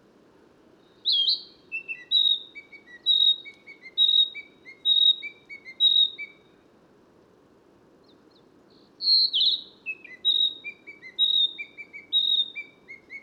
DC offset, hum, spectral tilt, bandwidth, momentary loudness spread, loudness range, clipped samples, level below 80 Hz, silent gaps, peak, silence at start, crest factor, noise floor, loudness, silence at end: under 0.1%; none; -0.5 dB/octave; 12 kHz; 22 LU; 5 LU; under 0.1%; -80 dBFS; none; -12 dBFS; 1.05 s; 16 dB; -58 dBFS; -21 LUFS; 0.05 s